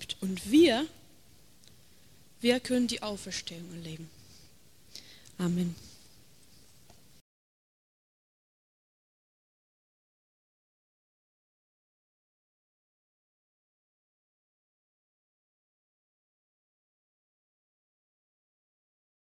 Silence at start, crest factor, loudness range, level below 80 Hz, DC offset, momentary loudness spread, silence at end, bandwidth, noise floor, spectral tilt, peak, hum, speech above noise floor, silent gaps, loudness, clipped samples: 0 s; 24 dB; 10 LU; -68 dBFS; 0.1%; 26 LU; 13.45 s; 16 kHz; -61 dBFS; -5 dB/octave; -12 dBFS; none; 32 dB; none; -29 LUFS; under 0.1%